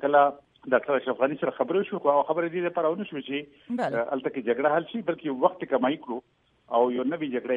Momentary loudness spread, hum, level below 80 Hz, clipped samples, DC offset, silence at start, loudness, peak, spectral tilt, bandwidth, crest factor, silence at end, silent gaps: 9 LU; none; -74 dBFS; under 0.1%; under 0.1%; 0 s; -27 LUFS; -6 dBFS; -7.5 dB/octave; 7.2 kHz; 20 dB; 0 s; none